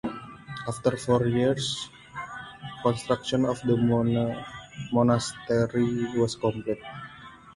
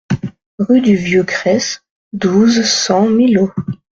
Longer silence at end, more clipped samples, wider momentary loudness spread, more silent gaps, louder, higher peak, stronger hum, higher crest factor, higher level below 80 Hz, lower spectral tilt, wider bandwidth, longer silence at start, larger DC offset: second, 0.05 s vs 0.25 s; neither; first, 17 LU vs 12 LU; second, none vs 0.46-0.58 s, 1.90-2.11 s; second, -26 LUFS vs -13 LUFS; second, -8 dBFS vs -2 dBFS; neither; first, 18 dB vs 12 dB; second, -56 dBFS vs -50 dBFS; first, -6 dB/octave vs -4.5 dB/octave; first, 11.5 kHz vs 7.8 kHz; about the same, 0.05 s vs 0.1 s; neither